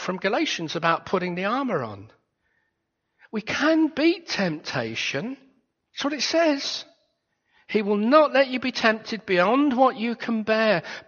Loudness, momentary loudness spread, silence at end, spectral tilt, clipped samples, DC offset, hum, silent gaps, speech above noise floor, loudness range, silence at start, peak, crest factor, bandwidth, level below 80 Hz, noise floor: -23 LUFS; 11 LU; 0.05 s; -3 dB/octave; under 0.1%; under 0.1%; none; none; 54 dB; 6 LU; 0 s; -4 dBFS; 22 dB; 7 kHz; -68 dBFS; -77 dBFS